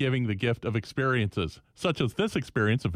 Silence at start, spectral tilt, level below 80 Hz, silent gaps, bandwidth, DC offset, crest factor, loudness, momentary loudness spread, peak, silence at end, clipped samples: 0 s; -6.5 dB/octave; -52 dBFS; none; 14 kHz; under 0.1%; 16 dB; -28 LUFS; 5 LU; -12 dBFS; 0 s; under 0.1%